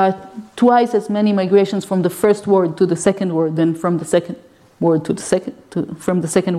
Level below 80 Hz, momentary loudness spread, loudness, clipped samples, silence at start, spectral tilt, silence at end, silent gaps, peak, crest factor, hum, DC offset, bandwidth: -56 dBFS; 11 LU; -17 LUFS; under 0.1%; 0 s; -6.5 dB/octave; 0 s; none; -2 dBFS; 16 dB; none; under 0.1%; 14.5 kHz